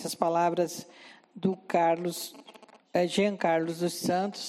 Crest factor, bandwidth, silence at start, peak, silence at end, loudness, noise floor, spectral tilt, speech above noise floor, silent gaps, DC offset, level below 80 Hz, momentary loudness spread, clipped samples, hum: 18 dB; 16 kHz; 0 s; -10 dBFS; 0 s; -29 LUFS; -54 dBFS; -5 dB/octave; 25 dB; none; under 0.1%; -76 dBFS; 10 LU; under 0.1%; none